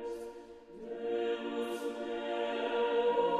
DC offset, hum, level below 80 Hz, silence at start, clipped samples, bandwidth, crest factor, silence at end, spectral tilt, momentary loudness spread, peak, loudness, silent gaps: under 0.1%; none; -72 dBFS; 0 s; under 0.1%; 13 kHz; 16 dB; 0 s; -4.5 dB/octave; 17 LU; -18 dBFS; -35 LUFS; none